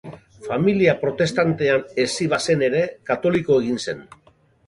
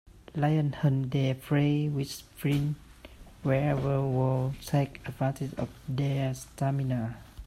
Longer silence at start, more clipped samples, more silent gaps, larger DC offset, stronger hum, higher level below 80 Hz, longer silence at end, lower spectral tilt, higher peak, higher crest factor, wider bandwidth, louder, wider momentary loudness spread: about the same, 0.05 s vs 0.15 s; neither; neither; neither; neither; about the same, -56 dBFS vs -52 dBFS; first, 0.65 s vs 0 s; second, -5.5 dB/octave vs -7.5 dB/octave; first, -2 dBFS vs -12 dBFS; about the same, 18 dB vs 16 dB; second, 11.5 kHz vs 14 kHz; first, -20 LUFS vs -30 LUFS; about the same, 10 LU vs 8 LU